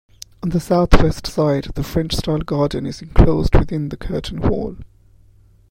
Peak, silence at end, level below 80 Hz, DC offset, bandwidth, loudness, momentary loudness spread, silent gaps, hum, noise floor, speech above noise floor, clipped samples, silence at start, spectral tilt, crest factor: 0 dBFS; 0.85 s; -22 dBFS; under 0.1%; 15.5 kHz; -19 LUFS; 11 LU; none; none; -50 dBFS; 34 dB; under 0.1%; 0.45 s; -7 dB/octave; 18 dB